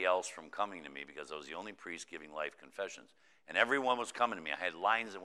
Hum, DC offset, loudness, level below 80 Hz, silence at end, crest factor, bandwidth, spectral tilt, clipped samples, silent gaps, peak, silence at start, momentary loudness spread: none; under 0.1%; -37 LUFS; -82 dBFS; 0 s; 24 dB; 13 kHz; -2 dB/octave; under 0.1%; none; -12 dBFS; 0 s; 14 LU